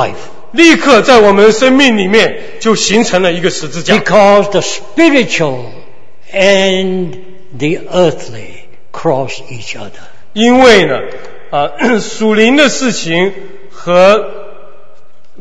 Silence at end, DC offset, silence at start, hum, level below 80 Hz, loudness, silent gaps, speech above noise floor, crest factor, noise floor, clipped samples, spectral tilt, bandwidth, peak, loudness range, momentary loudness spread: 0.9 s; 8%; 0 s; none; -44 dBFS; -9 LUFS; none; 38 dB; 12 dB; -47 dBFS; 1%; -4 dB/octave; 11 kHz; 0 dBFS; 6 LU; 18 LU